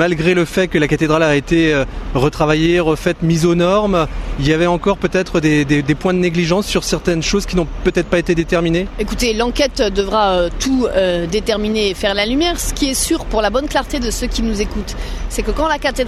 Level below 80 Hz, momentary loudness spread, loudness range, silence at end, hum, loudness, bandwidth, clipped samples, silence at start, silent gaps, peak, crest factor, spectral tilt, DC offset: -26 dBFS; 6 LU; 2 LU; 0 s; none; -16 LUFS; 14 kHz; under 0.1%; 0 s; none; 0 dBFS; 14 dB; -5 dB/octave; under 0.1%